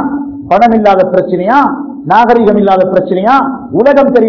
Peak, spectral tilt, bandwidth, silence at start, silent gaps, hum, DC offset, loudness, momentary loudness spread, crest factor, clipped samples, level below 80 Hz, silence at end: 0 dBFS; -8 dB/octave; 6 kHz; 0 s; none; none; under 0.1%; -8 LUFS; 7 LU; 8 dB; 4%; -42 dBFS; 0 s